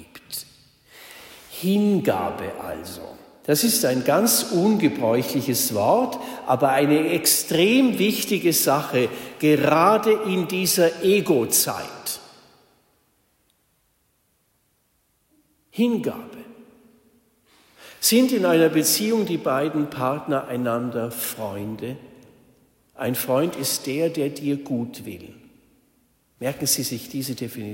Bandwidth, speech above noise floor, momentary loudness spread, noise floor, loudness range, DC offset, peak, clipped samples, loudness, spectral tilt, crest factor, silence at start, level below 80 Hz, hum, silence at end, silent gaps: 16.5 kHz; 46 dB; 16 LU; -67 dBFS; 12 LU; under 0.1%; -6 dBFS; under 0.1%; -21 LUFS; -4 dB/octave; 18 dB; 0 s; -64 dBFS; none; 0 s; none